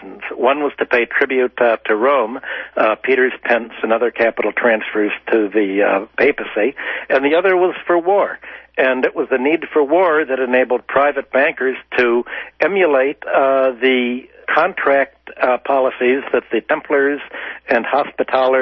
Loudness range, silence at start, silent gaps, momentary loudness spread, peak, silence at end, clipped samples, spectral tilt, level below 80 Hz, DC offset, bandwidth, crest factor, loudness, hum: 1 LU; 0 s; none; 5 LU; -2 dBFS; 0 s; under 0.1%; -6.5 dB/octave; -58 dBFS; under 0.1%; 6 kHz; 14 dB; -16 LUFS; none